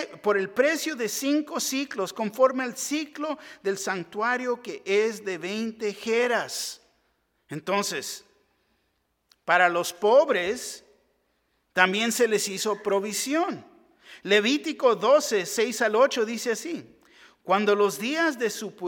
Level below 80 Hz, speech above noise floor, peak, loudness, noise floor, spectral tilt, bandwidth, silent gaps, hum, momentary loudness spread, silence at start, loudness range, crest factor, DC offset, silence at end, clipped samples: -74 dBFS; 48 dB; -4 dBFS; -25 LUFS; -73 dBFS; -3 dB/octave; 18 kHz; none; none; 12 LU; 0 s; 5 LU; 22 dB; under 0.1%; 0 s; under 0.1%